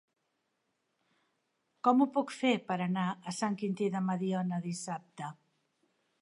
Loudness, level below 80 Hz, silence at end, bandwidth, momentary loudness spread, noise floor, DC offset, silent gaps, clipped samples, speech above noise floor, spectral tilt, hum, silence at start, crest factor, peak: -33 LUFS; -86 dBFS; 0.9 s; 11.5 kHz; 13 LU; -81 dBFS; under 0.1%; none; under 0.1%; 49 dB; -6 dB/octave; none; 1.85 s; 20 dB; -14 dBFS